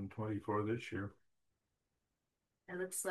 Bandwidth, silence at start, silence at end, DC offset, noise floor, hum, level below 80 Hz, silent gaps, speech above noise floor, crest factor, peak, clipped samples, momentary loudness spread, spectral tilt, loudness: 12.5 kHz; 0 s; 0 s; under 0.1%; -88 dBFS; none; -78 dBFS; none; 48 dB; 18 dB; -26 dBFS; under 0.1%; 10 LU; -5 dB/octave; -42 LUFS